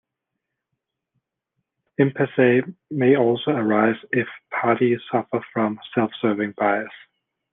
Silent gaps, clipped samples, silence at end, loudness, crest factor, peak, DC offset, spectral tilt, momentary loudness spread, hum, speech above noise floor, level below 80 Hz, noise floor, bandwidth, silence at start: none; under 0.1%; 0.55 s; -21 LUFS; 20 dB; -2 dBFS; under 0.1%; -10 dB/octave; 8 LU; none; 61 dB; -68 dBFS; -82 dBFS; 3.9 kHz; 2 s